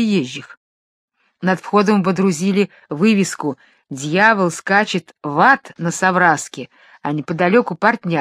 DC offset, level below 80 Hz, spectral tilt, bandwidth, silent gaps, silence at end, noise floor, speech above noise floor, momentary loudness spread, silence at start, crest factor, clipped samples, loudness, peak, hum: under 0.1%; -66 dBFS; -5 dB/octave; 13.5 kHz; 0.57-1.08 s; 0 s; under -90 dBFS; over 73 dB; 14 LU; 0 s; 18 dB; under 0.1%; -17 LUFS; 0 dBFS; none